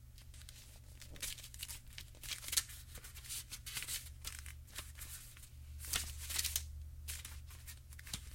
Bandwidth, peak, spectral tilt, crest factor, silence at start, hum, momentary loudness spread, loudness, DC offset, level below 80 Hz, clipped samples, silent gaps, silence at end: 17 kHz; -12 dBFS; -0.5 dB/octave; 34 dB; 0 s; none; 18 LU; -43 LUFS; under 0.1%; -54 dBFS; under 0.1%; none; 0 s